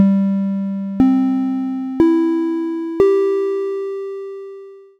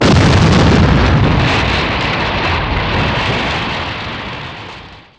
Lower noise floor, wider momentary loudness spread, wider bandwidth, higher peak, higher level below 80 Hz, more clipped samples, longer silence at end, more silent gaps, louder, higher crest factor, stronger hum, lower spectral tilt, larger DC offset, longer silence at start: about the same, -37 dBFS vs -34 dBFS; about the same, 14 LU vs 15 LU; second, 7 kHz vs 9.8 kHz; about the same, 0 dBFS vs 0 dBFS; second, -50 dBFS vs -22 dBFS; neither; about the same, 0.2 s vs 0.2 s; neither; second, -18 LUFS vs -13 LUFS; first, 18 dB vs 12 dB; neither; first, -9.5 dB/octave vs -6 dB/octave; neither; about the same, 0 s vs 0 s